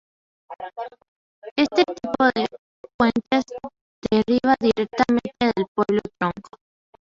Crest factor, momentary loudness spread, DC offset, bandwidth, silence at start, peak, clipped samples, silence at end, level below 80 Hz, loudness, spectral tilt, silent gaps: 20 dB; 17 LU; under 0.1%; 7.6 kHz; 0.5 s; -4 dBFS; under 0.1%; 0.6 s; -54 dBFS; -22 LUFS; -6 dB/octave; 1.08-1.42 s, 1.51-1.56 s, 2.58-2.84 s, 2.94-2.99 s, 3.81-4.02 s, 5.68-5.75 s